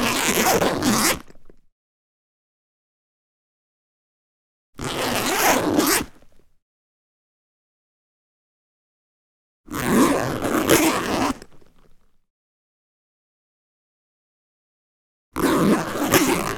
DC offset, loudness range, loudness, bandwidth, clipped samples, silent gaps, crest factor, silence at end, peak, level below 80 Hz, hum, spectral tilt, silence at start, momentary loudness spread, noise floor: under 0.1%; 10 LU; -20 LUFS; 19.5 kHz; under 0.1%; 1.72-4.73 s, 6.62-9.64 s, 12.30-15.32 s; 24 dB; 0 s; 0 dBFS; -48 dBFS; none; -3.5 dB/octave; 0 s; 11 LU; -51 dBFS